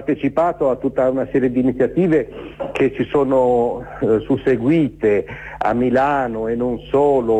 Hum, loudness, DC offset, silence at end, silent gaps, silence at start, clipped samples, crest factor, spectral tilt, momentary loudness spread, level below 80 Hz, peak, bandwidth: none; -18 LUFS; under 0.1%; 0 s; none; 0 s; under 0.1%; 12 dB; -8.5 dB/octave; 6 LU; -44 dBFS; -6 dBFS; 9 kHz